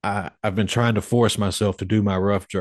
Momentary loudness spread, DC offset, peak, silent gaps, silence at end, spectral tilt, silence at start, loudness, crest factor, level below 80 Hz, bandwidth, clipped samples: 6 LU; under 0.1%; -4 dBFS; none; 0 s; -5.5 dB/octave; 0.05 s; -22 LUFS; 16 dB; -50 dBFS; 12.5 kHz; under 0.1%